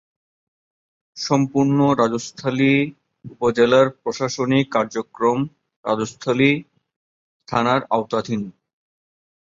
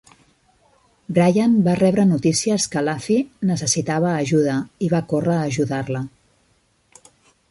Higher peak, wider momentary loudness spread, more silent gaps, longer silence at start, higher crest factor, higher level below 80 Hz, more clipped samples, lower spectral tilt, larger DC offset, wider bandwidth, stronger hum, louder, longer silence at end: about the same, -4 dBFS vs -6 dBFS; first, 10 LU vs 7 LU; first, 5.76-5.83 s, 6.96-7.40 s vs none; about the same, 1.15 s vs 1.1 s; about the same, 18 dB vs 16 dB; about the same, -60 dBFS vs -56 dBFS; neither; about the same, -6 dB/octave vs -5.5 dB/octave; neither; second, 7.6 kHz vs 11.5 kHz; neither; about the same, -20 LUFS vs -19 LUFS; second, 1.05 s vs 1.45 s